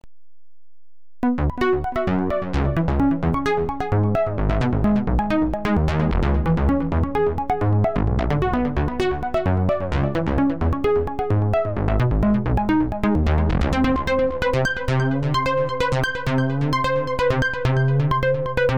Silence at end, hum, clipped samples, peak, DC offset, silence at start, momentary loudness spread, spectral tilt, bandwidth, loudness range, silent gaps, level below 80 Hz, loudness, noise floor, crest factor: 0 s; none; under 0.1%; -6 dBFS; 2%; 1.25 s; 3 LU; -8 dB/octave; 11 kHz; 1 LU; none; -28 dBFS; -21 LUFS; -80 dBFS; 14 dB